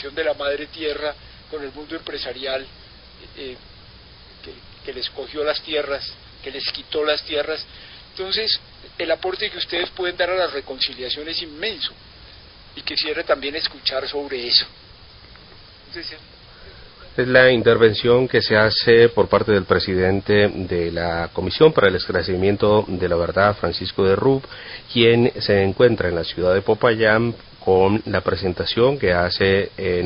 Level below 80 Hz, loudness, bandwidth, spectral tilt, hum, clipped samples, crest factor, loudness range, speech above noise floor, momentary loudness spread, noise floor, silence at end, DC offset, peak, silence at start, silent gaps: -42 dBFS; -19 LUFS; 5.4 kHz; -9.5 dB/octave; none; under 0.1%; 20 dB; 12 LU; 25 dB; 18 LU; -44 dBFS; 0 s; under 0.1%; 0 dBFS; 0 s; none